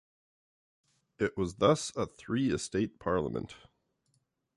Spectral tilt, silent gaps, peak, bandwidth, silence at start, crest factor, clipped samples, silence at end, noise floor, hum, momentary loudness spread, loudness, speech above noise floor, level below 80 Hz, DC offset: -5.5 dB/octave; none; -12 dBFS; 11.5 kHz; 1.2 s; 22 dB; under 0.1%; 1 s; -76 dBFS; none; 10 LU; -32 LUFS; 45 dB; -58 dBFS; under 0.1%